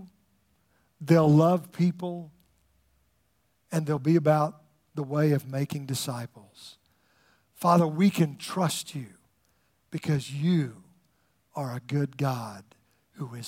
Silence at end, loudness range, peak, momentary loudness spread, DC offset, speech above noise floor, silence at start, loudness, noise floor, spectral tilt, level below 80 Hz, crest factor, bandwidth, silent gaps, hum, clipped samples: 0 s; 5 LU; -8 dBFS; 20 LU; under 0.1%; 45 dB; 0 s; -27 LUFS; -71 dBFS; -6.5 dB/octave; -70 dBFS; 20 dB; 16.5 kHz; none; none; under 0.1%